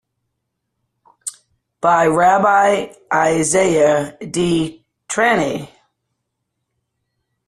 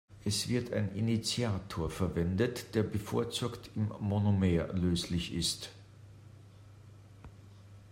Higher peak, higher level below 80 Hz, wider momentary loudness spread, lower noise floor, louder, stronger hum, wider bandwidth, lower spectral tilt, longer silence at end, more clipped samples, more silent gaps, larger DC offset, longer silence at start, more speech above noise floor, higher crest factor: first, -2 dBFS vs -16 dBFS; about the same, -54 dBFS vs -56 dBFS; first, 15 LU vs 8 LU; first, -75 dBFS vs -54 dBFS; first, -16 LUFS vs -33 LUFS; neither; second, 13 kHz vs 16 kHz; second, -4 dB/octave vs -5.5 dB/octave; first, 1.8 s vs 0 s; neither; neither; neither; first, 1.25 s vs 0.1 s; first, 60 dB vs 22 dB; about the same, 16 dB vs 18 dB